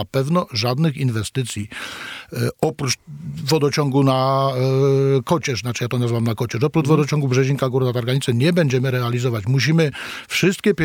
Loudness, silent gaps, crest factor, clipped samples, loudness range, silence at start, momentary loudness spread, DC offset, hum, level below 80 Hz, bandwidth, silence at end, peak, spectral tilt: -19 LUFS; none; 16 dB; under 0.1%; 4 LU; 0 s; 8 LU; under 0.1%; none; -54 dBFS; 16.5 kHz; 0 s; -4 dBFS; -6 dB/octave